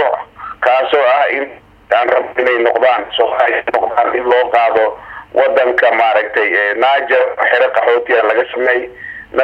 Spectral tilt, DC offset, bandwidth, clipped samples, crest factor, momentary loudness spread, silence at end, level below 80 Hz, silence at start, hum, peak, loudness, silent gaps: -4.5 dB/octave; under 0.1%; 5.8 kHz; under 0.1%; 14 dB; 7 LU; 0 s; -52 dBFS; 0 s; none; 0 dBFS; -13 LUFS; none